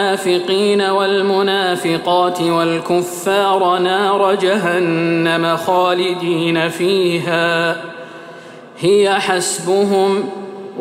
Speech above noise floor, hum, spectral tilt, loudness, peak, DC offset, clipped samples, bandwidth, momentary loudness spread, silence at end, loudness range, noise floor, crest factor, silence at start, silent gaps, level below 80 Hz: 21 dB; none; -4.5 dB/octave; -15 LUFS; -2 dBFS; under 0.1%; under 0.1%; 16 kHz; 6 LU; 0 s; 2 LU; -36 dBFS; 14 dB; 0 s; none; -66 dBFS